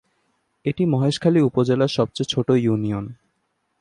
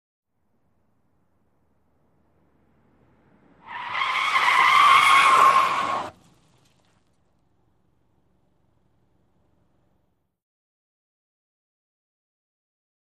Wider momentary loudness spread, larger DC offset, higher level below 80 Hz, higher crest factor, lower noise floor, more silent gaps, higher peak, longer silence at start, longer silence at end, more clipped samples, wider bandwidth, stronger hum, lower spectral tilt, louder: second, 10 LU vs 18 LU; neither; first, -56 dBFS vs -72 dBFS; second, 16 dB vs 22 dB; about the same, -72 dBFS vs -71 dBFS; neither; about the same, -4 dBFS vs -4 dBFS; second, 0.65 s vs 3.7 s; second, 0.65 s vs 7.1 s; neither; second, 11 kHz vs 15 kHz; neither; first, -7 dB/octave vs -0.5 dB/octave; second, -21 LUFS vs -17 LUFS